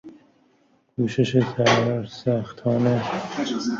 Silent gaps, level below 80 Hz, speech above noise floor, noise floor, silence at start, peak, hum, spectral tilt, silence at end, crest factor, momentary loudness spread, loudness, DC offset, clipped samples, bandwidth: none; -58 dBFS; 40 dB; -62 dBFS; 0.05 s; -4 dBFS; none; -6 dB/octave; 0 s; 18 dB; 8 LU; -23 LUFS; under 0.1%; under 0.1%; 7.6 kHz